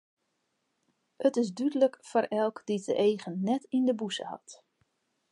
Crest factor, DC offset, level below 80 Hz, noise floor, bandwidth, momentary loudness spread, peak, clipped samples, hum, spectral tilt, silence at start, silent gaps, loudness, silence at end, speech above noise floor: 18 dB; under 0.1%; -84 dBFS; -79 dBFS; 11.5 kHz; 8 LU; -12 dBFS; under 0.1%; none; -5.5 dB/octave; 1.2 s; none; -29 LUFS; 0.75 s; 50 dB